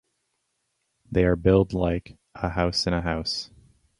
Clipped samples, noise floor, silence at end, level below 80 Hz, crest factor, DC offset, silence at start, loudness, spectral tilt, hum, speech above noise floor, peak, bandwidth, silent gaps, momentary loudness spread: under 0.1%; -76 dBFS; 0.55 s; -38 dBFS; 20 dB; under 0.1%; 1.1 s; -25 LUFS; -6 dB/octave; none; 52 dB; -6 dBFS; 11.5 kHz; none; 11 LU